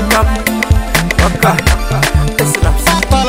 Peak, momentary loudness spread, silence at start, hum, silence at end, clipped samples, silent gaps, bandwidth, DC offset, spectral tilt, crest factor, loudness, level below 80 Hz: 0 dBFS; 3 LU; 0 s; none; 0 s; under 0.1%; none; 16.5 kHz; 0.4%; -4.5 dB/octave; 12 dB; -12 LUFS; -16 dBFS